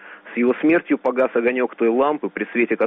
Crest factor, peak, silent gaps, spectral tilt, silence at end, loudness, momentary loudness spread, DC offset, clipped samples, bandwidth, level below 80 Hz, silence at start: 12 dB; -8 dBFS; none; -4.5 dB/octave; 0 s; -20 LUFS; 5 LU; under 0.1%; under 0.1%; 3.9 kHz; -66 dBFS; 0 s